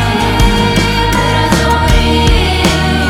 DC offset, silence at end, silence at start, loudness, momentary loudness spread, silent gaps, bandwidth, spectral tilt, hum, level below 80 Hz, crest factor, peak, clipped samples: under 0.1%; 0 s; 0 s; -11 LUFS; 1 LU; none; 17 kHz; -5 dB/octave; none; -16 dBFS; 10 dB; 0 dBFS; under 0.1%